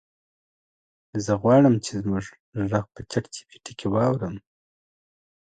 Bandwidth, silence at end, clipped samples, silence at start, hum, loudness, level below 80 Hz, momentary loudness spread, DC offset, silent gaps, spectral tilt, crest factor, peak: 9.4 kHz; 1.05 s; under 0.1%; 1.15 s; none; -24 LUFS; -54 dBFS; 20 LU; under 0.1%; 2.40-2.52 s; -7 dB/octave; 18 dB; -6 dBFS